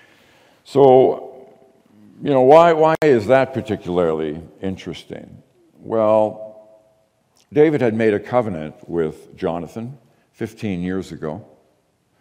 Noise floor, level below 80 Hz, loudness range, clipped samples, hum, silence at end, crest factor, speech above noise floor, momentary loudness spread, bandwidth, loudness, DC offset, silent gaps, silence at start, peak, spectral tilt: -63 dBFS; -58 dBFS; 10 LU; under 0.1%; none; 0.8 s; 18 dB; 46 dB; 20 LU; 11.5 kHz; -17 LUFS; under 0.1%; none; 0.7 s; 0 dBFS; -7.5 dB/octave